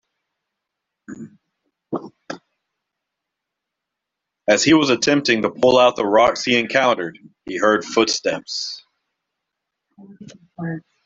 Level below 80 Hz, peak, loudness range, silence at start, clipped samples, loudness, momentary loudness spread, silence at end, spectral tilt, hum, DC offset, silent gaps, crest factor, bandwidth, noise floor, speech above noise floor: -60 dBFS; -2 dBFS; 21 LU; 1.1 s; under 0.1%; -17 LUFS; 22 LU; 0.25 s; -3.5 dB/octave; none; under 0.1%; none; 20 dB; 8 kHz; -82 dBFS; 64 dB